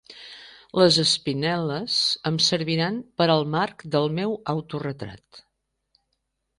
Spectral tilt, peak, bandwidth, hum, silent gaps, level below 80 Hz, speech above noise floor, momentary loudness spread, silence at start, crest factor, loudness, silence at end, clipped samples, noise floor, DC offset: -4.5 dB/octave; -6 dBFS; 11.5 kHz; none; none; -60 dBFS; 53 dB; 18 LU; 0.1 s; 20 dB; -23 LUFS; 1.2 s; under 0.1%; -77 dBFS; under 0.1%